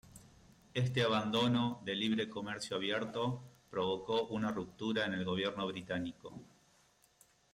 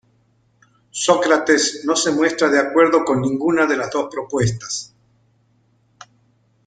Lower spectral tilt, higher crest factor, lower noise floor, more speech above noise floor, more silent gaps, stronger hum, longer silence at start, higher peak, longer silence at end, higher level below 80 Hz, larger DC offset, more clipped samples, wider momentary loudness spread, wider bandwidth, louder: first, -5.5 dB/octave vs -4 dB/octave; about the same, 16 dB vs 18 dB; first, -70 dBFS vs -60 dBFS; second, 34 dB vs 43 dB; neither; neither; second, 0.05 s vs 0.95 s; second, -22 dBFS vs -2 dBFS; second, 1.1 s vs 1.8 s; second, -70 dBFS vs -54 dBFS; neither; neither; about the same, 10 LU vs 9 LU; first, 14.5 kHz vs 9.6 kHz; second, -36 LUFS vs -18 LUFS